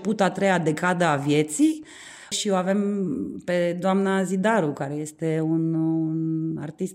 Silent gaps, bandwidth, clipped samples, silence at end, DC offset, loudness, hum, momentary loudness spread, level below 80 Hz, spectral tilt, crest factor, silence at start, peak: none; 15 kHz; under 0.1%; 0 s; under 0.1%; -24 LUFS; none; 9 LU; -68 dBFS; -5.5 dB/octave; 16 dB; 0 s; -8 dBFS